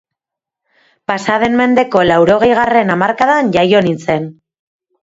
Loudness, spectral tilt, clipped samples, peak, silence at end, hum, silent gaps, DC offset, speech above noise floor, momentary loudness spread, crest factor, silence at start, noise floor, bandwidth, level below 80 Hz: -12 LUFS; -6 dB/octave; under 0.1%; 0 dBFS; 0.7 s; none; none; under 0.1%; 72 dB; 9 LU; 14 dB; 1.1 s; -84 dBFS; 8 kHz; -48 dBFS